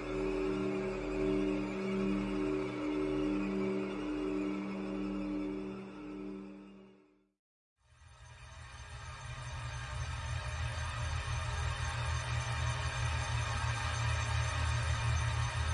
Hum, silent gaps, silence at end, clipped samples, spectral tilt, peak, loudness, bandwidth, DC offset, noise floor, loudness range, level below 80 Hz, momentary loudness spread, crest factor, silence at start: none; 7.39-7.76 s; 0 s; under 0.1%; -5.5 dB/octave; -22 dBFS; -36 LUFS; 11 kHz; under 0.1%; -65 dBFS; 13 LU; -46 dBFS; 12 LU; 14 dB; 0 s